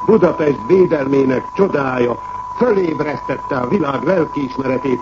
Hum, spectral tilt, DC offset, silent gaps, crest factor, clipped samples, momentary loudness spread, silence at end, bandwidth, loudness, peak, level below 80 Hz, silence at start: none; -8 dB/octave; under 0.1%; none; 16 dB; under 0.1%; 8 LU; 0 s; 7.2 kHz; -16 LUFS; 0 dBFS; -46 dBFS; 0 s